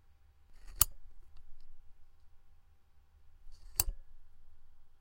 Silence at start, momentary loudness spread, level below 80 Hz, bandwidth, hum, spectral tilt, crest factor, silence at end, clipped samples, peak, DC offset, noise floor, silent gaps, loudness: 0.05 s; 26 LU; -50 dBFS; 16 kHz; none; -0.5 dB/octave; 40 dB; 0 s; under 0.1%; -2 dBFS; under 0.1%; -62 dBFS; none; -33 LUFS